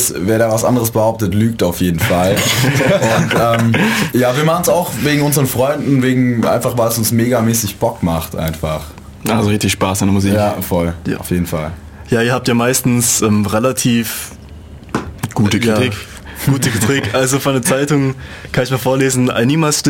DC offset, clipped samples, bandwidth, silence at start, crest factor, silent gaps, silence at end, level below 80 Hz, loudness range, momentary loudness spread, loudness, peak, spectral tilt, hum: under 0.1%; under 0.1%; 17 kHz; 0 s; 12 dB; none; 0 s; -38 dBFS; 3 LU; 9 LU; -14 LUFS; -2 dBFS; -5 dB/octave; none